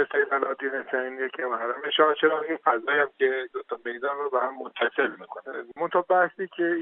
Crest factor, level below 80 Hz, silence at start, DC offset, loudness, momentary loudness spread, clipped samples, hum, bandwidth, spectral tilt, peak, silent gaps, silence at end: 20 dB; -84 dBFS; 0 s; under 0.1%; -26 LUFS; 11 LU; under 0.1%; none; 4 kHz; -0.5 dB/octave; -6 dBFS; none; 0 s